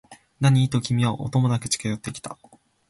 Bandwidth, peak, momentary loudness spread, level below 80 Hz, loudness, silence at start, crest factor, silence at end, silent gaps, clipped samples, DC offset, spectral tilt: 11.5 kHz; -6 dBFS; 14 LU; -54 dBFS; -23 LUFS; 0.1 s; 16 dB; 0.55 s; none; under 0.1%; under 0.1%; -5.5 dB/octave